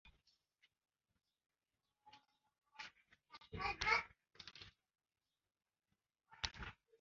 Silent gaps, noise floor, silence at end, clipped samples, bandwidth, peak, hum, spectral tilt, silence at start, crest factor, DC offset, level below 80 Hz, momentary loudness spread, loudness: none; under -90 dBFS; 0.3 s; under 0.1%; 7.2 kHz; -20 dBFS; none; 0 dB/octave; 0.05 s; 30 dB; under 0.1%; -66 dBFS; 23 LU; -42 LUFS